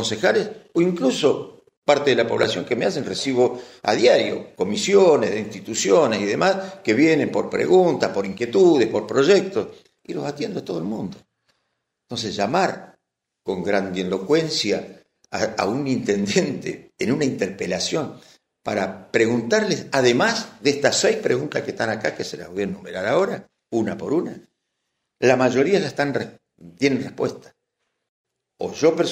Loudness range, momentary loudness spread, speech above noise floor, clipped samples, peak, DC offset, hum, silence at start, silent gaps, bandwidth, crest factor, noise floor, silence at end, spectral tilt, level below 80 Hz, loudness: 7 LU; 12 LU; 57 dB; under 0.1%; -2 dBFS; under 0.1%; none; 0 s; 1.77-1.82 s, 28.09-28.24 s; 15 kHz; 20 dB; -77 dBFS; 0 s; -4.5 dB/octave; -64 dBFS; -21 LUFS